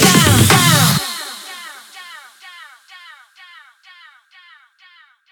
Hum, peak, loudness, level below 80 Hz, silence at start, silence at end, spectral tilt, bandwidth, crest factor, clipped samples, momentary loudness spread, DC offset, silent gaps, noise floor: none; 0 dBFS; -11 LUFS; -42 dBFS; 0 s; 3.15 s; -3.5 dB/octave; 19.5 kHz; 18 dB; under 0.1%; 27 LU; under 0.1%; none; -49 dBFS